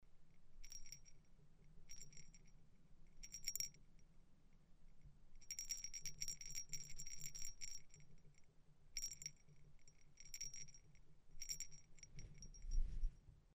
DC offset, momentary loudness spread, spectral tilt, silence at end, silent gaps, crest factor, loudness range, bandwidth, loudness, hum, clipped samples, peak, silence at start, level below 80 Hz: under 0.1%; 15 LU; -0.5 dB/octave; 0.05 s; none; 26 dB; 5 LU; 15.5 kHz; -51 LUFS; none; under 0.1%; -26 dBFS; 0 s; -54 dBFS